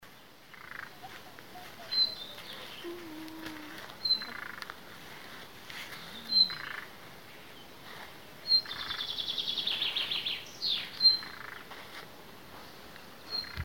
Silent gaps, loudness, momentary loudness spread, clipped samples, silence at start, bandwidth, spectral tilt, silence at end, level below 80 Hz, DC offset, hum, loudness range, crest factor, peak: none; -30 LUFS; 23 LU; under 0.1%; 0 s; 17 kHz; -2 dB/octave; 0 s; -68 dBFS; 0.2%; none; 7 LU; 24 dB; -12 dBFS